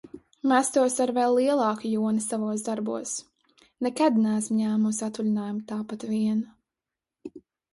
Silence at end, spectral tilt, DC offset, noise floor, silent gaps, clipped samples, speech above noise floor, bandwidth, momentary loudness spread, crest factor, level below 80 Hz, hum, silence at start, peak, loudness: 0.35 s; -5 dB/octave; under 0.1%; -89 dBFS; none; under 0.1%; 64 dB; 11.5 kHz; 12 LU; 18 dB; -72 dBFS; none; 0.05 s; -8 dBFS; -26 LUFS